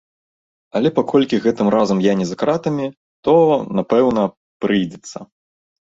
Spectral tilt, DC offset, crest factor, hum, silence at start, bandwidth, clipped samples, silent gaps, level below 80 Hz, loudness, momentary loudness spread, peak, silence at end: -6.5 dB/octave; under 0.1%; 16 dB; none; 0.75 s; 7.8 kHz; under 0.1%; 2.97-3.23 s, 4.37-4.60 s; -58 dBFS; -17 LUFS; 11 LU; -2 dBFS; 0.6 s